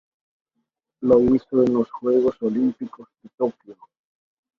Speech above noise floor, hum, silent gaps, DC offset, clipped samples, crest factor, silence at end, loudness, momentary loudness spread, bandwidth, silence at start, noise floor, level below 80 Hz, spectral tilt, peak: 57 dB; none; 3.34-3.38 s; under 0.1%; under 0.1%; 18 dB; 0.85 s; -21 LUFS; 10 LU; 6.2 kHz; 1 s; -77 dBFS; -54 dBFS; -9.5 dB/octave; -4 dBFS